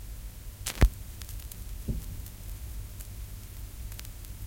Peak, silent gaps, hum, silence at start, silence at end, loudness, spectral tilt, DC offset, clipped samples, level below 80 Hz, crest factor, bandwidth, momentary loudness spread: -6 dBFS; none; none; 0 s; 0 s; -37 LUFS; -4.5 dB/octave; under 0.1%; under 0.1%; -36 dBFS; 28 dB; 17 kHz; 16 LU